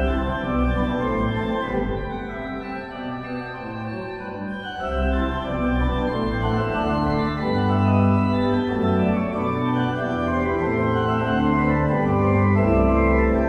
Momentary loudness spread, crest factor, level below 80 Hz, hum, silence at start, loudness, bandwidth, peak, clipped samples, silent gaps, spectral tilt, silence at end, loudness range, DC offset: 12 LU; 14 dB; -32 dBFS; none; 0 s; -22 LUFS; 6.6 kHz; -6 dBFS; under 0.1%; none; -8.5 dB/octave; 0 s; 8 LU; under 0.1%